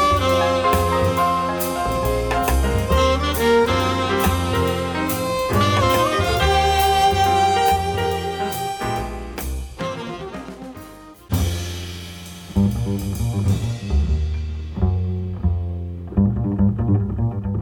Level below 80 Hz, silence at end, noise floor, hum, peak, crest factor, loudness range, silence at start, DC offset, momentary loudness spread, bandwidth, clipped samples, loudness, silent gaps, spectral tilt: -28 dBFS; 0 s; -40 dBFS; none; -4 dBFS; 16 dB; 10 LU; 0 s; under 0.1%; 13 LU; over 20 kHz; under 0.1%; -20 LUFS; none; -5.5 dB/octave